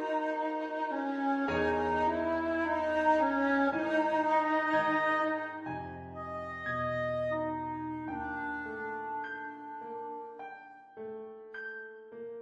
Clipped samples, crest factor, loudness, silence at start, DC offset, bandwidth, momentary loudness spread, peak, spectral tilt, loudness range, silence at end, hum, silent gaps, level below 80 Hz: under 0.1%; 18 dB; -32 LUFS; 0 s; under 0.1%; 9.6 kHz; 16 LU; -16 dBFS; -6.5 dB/octave; 12 LU; 0 s; none; none; -62 dBFS